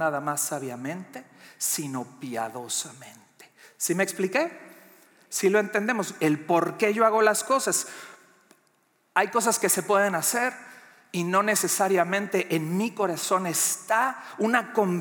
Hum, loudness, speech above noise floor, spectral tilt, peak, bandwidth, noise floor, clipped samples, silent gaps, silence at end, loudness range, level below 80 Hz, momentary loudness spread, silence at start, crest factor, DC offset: none; -25 LUFS; 42 dB; -3.5 dB/octave; -6 dBFS; 19.5 kHz; -67 dBFS; under 0.1%; none; 0 s; 6 LU; -90 dBFS; 12 LU; 0 s; 20 dB; under 0.1%